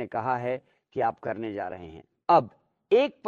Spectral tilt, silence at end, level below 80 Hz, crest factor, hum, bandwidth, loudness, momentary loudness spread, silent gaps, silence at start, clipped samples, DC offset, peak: -7.5 dB/octave; 0 s; -66 dBFS; 20 dB; none; 7.2 kHz; -27 LUFS; 17 LU; none; 0 s; under 0.1%; under 0.1%; -8 dBFS